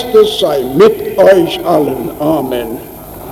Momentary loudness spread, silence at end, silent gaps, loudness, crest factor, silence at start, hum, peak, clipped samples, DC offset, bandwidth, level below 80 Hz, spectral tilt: 16 LU; 0 s; none; -11 LUFS; 10 dB; 0 s; none; 0 dBFS; under 0.1%; under 0.1%; 18 kHz; -40 dBFS; -5.5 dB/octave